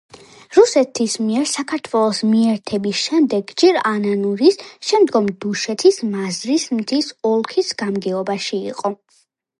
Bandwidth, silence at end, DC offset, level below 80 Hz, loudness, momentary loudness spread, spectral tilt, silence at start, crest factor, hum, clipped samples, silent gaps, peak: 11.5 kHz; 0.65 s; under 0.1%; -64 dBFS; -18 LUFS; 8 LU; -4 dB/octave; 0.15 s; 18 dB; none; under 0.1%; none; 0 dBFS